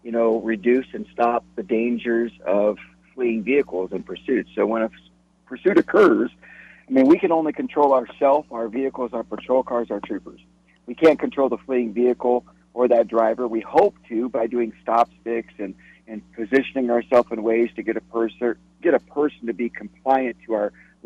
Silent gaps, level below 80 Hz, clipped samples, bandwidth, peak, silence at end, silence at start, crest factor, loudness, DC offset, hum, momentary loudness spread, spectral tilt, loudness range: none; -60 dBFS; under 0.1%; 7.8 kHz; -4 dBFS; 0.35 s; 0.05 s; 18 dB; -21 LUFS; under 0.1%; none; 11 LU; -7.5 dB/octave; 4 LU